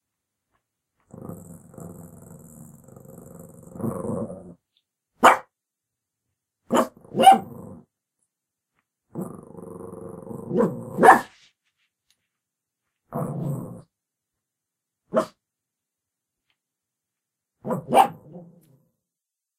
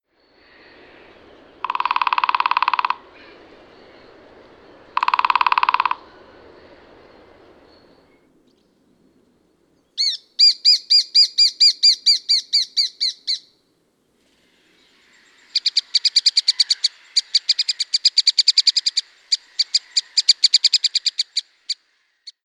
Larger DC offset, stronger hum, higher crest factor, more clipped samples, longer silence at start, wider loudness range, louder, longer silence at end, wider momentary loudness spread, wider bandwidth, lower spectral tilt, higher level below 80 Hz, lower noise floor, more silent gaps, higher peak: neither; neither; first, 26 dB vs 20 dB; neither; second, 1.25 s vs 1.65 s; first, 15 LU vs 10 LU; second, -21 LUFS vs -16 LUFS; first, 1.2 s vs 0.15 s; first, 27 LU vs 13 LU; about the same, 16 kHz vs 15 kHz; first, -5 dB/octave vs 3.5 dB/octave; about the same, -66 dBFS vs -68 dBFS; first, -87 dBFS vs -64 dBFS; neither; about the same, 0 dBFS vs 0 dBFS